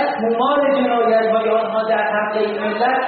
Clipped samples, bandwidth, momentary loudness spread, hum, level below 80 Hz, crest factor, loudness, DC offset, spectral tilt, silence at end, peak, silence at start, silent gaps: under 0.1%; 4.7 kHz; 4 LU; none; -64 dBFS; 12 dB; -17 LUFS; under 0.1%; -2.5 dB/octave; 0 s; -6 dBFS; 0 s; none